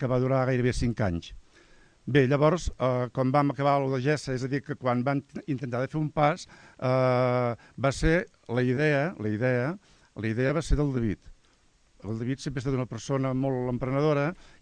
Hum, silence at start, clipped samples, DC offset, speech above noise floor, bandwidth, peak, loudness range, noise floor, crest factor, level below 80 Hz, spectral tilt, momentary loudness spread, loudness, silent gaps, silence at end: none; 0 s; under 0.1%; under 0.1%; 36 dB; 10 kHz; -10 dBFS; 4 LU; -63 dBFS; 18 dB; -42 dBFS; -7 dB/octave; 9 LU; -27 LUFS; none; 0.3 s